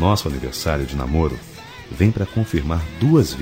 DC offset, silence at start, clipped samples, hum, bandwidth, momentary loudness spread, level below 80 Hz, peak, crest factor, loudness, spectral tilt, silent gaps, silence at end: 0.1%; 0 s; under 0.1%; none; 16.5 kHz; 17 LU; -30 dBFS; -2 dBFS; 18 dB; -20 LUFS; -6.5 dB/octave; none; 0 s